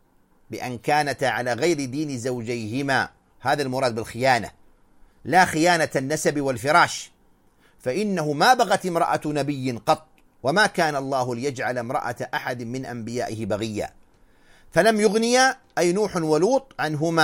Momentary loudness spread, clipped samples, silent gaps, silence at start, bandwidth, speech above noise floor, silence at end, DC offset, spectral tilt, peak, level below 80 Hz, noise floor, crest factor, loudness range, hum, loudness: 12 LU; under 0.1%; none; 0.5 s; 16.5 kHz; 36 dB; 0 s; under 0.1%; -4.5 dB/octave; -4 dBFS; -58 dBFS; -58 dBFS; 20 dB; 4 LU; none; -23 LUFS